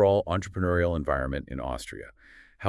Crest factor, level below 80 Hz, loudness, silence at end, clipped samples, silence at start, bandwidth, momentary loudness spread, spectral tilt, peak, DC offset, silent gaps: 18 dB; -42 dBFS; -28 LUFS; 0 s; under 0.1%; 0 s; 12 kHz; 15 LU; -6.5 dB/octave; -10 dBFS; under 0.1%; none